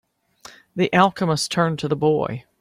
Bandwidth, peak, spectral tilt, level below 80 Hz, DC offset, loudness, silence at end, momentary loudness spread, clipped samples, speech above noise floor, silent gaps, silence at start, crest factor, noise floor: 15.5 kHz; -2 dBFS; -5.5 dB/octave; -58 dBFS; under 0.1%; -20 LUFS; 0.2 s; 8 LU; under 0.1%; 28 dB; none; 0.75 s; 20 dB; -47 dBFS